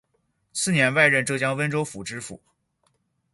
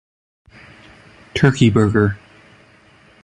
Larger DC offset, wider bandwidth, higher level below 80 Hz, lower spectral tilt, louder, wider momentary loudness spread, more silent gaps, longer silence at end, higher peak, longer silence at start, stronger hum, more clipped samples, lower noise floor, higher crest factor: neither; about the same, 12 kHz vs 11 kHz; second, -64 dBFS vs -42 dBFS; second, -4 dB/octave vs -7 dB/octave; second, -22 LUFS vs -16 LUFS; first, 16 LU vs 13 LU; neither; about the same, 1 s vs 1.05 s; about the same, -2 dBFS vs 0 dBFS; second, 0.55 s vs 1.35 s; neither; neither; first, -71 dBFS vs -50 dBFS; about the same, 22 dB vs 20 dB